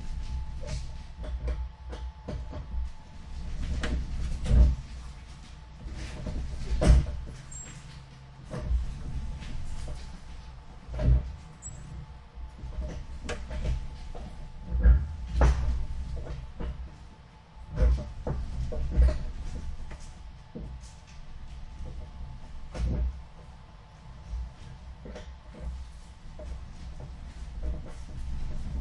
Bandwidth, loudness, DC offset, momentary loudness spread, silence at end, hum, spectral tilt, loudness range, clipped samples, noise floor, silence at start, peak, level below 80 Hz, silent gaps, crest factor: 10 kHz; -33 LUFS; under 0.1%; 21 LU; 0 s; none; -6.5 dB/octave; 12 LU; under 0.1%; -50 dBFS; 0 s; -6 dBFS; -32 dBFS; none; 24 dB